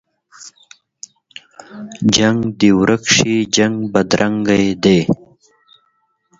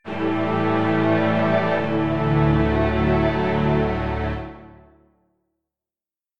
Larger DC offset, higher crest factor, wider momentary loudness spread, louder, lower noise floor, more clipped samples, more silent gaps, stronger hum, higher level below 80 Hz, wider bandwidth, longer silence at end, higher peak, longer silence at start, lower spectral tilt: second, under 0.1% vs 1%; about the same, 16 dB vs 14 dB; first, 21 LU vs 6 LU; first, -14 LUFS vs -21 LUFS; second, -63 dBFS vs under -90 dBFS; neither; neither; neither; second, -46 dBFS vs -34 dBFS; first, 7.8 kHz vs 6.8 kHz; first, 1.25 s vs 0 s; first, 0 dBFS vs -6 dBFS; first, 0.4 s vs 0 s; second, -4 dB/octave vs -9 dB/octave